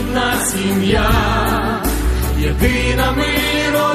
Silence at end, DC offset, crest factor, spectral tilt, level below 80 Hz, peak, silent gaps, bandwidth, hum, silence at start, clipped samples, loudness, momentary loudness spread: 0 s; under 0.1%; 14 dB; -4.5 dB/octave; -22 dBFS; -2 dBFS; none; 14 kHz; none; 0 s; under 0.1%; -16 LUFS; 4 LU